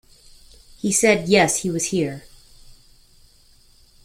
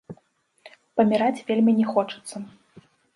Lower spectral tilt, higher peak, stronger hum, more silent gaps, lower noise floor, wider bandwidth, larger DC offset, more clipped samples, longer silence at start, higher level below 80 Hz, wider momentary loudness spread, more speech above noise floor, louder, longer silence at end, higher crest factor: second, -3.5 dB/octave vs -6.5 dB/octave; first, -2 dBFS vs -6 dBFS; neither; neither; second, -53 dBFS vs -64 dBFS; first, 16.5 kHz vs 11.5 kHz; neither; neither; first, 0.85 s vs 0.1 s; first, -52 dBFS vs -70 dBFS; second, 12 LU vs 18 LU; second, 34 dB vs 42 dB; first, -19 LUFS vs -22 LUFS; first, 1.3 s vs 0.7 s; about the same, 22 dB vs 18 dB